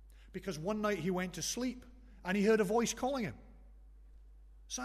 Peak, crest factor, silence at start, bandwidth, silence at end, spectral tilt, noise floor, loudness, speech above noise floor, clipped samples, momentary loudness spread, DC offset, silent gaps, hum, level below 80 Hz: -18 dBFS; 18 dB; 0 s; 13.5 kHz; 0 s; -4.5 dB/octave; -57 dBFS; -35 LUFS; 22 dB; under 0.1%; 15 LU; under 0.1%; none; none; -56 dBFS